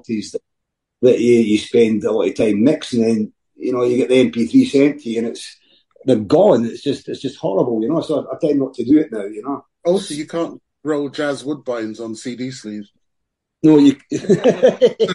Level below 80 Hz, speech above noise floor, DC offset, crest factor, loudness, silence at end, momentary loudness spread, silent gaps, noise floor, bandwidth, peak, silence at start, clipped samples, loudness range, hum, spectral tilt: -58 dBFS; 61 dB; under 0.1%; 16 dB; -17 LUFS; 0 s; 14 LU; none; -77 dBFS; 11.5 kHz; -2 dBFS; 0.1 s; under 0.1%; 7 LU; none; -6 dB/octave